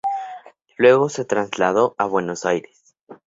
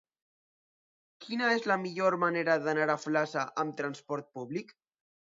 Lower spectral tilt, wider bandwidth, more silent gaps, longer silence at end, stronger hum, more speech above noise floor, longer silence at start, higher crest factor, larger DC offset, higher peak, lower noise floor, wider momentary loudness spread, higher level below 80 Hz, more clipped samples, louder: about the same, -5 dB/octave vs -5 dB/octave; about the same, 8 kHz vs 7.8 kHz; first, 3.03-3.07 s vs none; second, 0.1 s vs 0.65 s; neither; second, 22 dB vs over 59 dB; second, 0.05 s vs 1.2 s; about the same, 18 dB vs 20 dB; neither; first, -2 dBFS vs -12 dBFS; second, -40 dBFS vs under -90 dBFS; about the same, 13 LU vs 11 LU; first, -64 dBFS vs -84 dBFS; neither; first, -19 LUFS vs -31 LUFS